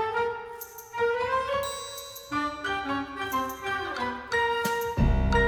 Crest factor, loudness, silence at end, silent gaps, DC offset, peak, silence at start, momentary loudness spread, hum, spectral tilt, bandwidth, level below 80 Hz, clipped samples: 16 dB; -29 LUFS; 0 s; none; under 0.1%; -12 dBFS; 0 s; 11 LU; none; -5 dB/octave; over 20 kHz; -36 dBFS; under 0.1%